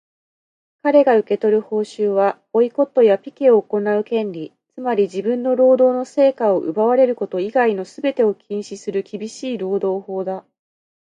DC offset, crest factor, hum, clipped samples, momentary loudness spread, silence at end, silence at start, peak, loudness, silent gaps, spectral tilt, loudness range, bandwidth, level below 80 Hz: under 0.1%; 16 dB; none; under 0.1%; 12 LU; 0.8 s; 0.85 s; -4 dBFS; -18 LUFS; none; -6.5 dB/octave; 5 LU; 9.4 kHz; -72 dBFS